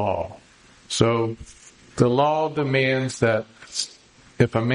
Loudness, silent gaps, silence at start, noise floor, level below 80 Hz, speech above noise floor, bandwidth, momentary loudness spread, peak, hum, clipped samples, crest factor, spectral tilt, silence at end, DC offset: -23 LUFS; none; 0 s; -51 dBFS; -52 dBFS; 30 dB; 10.5 kHz; 11 LU; -4 dBFS; none; under 0.1%; 20 dB; -5.5 dB/octave; 0 s; under 0.1%